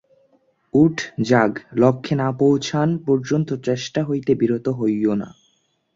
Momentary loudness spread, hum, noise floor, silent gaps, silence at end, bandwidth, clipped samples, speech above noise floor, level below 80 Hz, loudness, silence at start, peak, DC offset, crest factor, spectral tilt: 6 LU; none; -65 dBFS; none; 0.65 s; 7.8 kHz; under 0.1%; 46 dB; -58 dBFS; -20 LUFS; 0.75 s; -2 dBFS; under 0.1%; 18 dB; -7 dB/octave